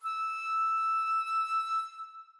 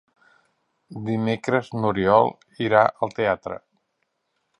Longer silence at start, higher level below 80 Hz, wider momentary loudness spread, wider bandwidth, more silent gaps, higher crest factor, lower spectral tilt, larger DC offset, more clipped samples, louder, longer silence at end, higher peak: second, 0 s vs 0.9 s; second, under -90 dBFS vs -58 dBFS; second, 6 LU vs 16 LU; about the same, 11.5 kHz vs 10.5 kHz; neither; second, 8 dB vs 22 dB; second, 8.5 dB/octave vs -7 dB/octave; neither; neither; second, -30 LUFS vs -22 LUFS; second, 0.1 s vs 1 s; second, -24 dBFS vs -2 dBFS